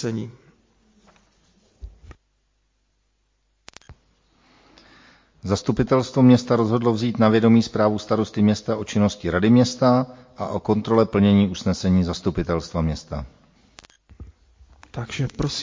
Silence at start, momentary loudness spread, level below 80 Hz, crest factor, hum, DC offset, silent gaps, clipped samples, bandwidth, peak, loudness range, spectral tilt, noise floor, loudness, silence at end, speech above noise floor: 0 s; 15 LU; -42 dBFS; 18 dB; none; under 0.1%; none; under 0.1%; 7.6 kHz; -4 dBFS; 11 LU; -7 dB/octave; -68 dBFS; -20 LUFS; 0 s; 48 dB